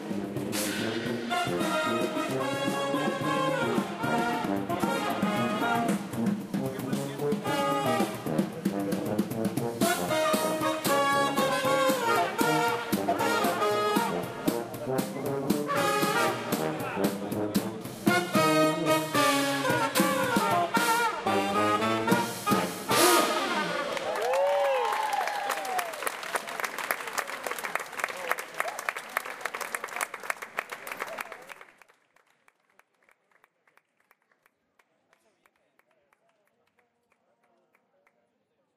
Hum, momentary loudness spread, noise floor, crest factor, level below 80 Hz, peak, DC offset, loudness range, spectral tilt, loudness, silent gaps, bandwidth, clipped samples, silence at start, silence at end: none; 9 LU; -75 dBFS; 22 dB; -66 dBFS; -8 dBFS; under 0.1%; 8 LU; -4 dB/octave; -28 LUFS; none; 16 kHz; under 0.1%; 0 s; 7.1 s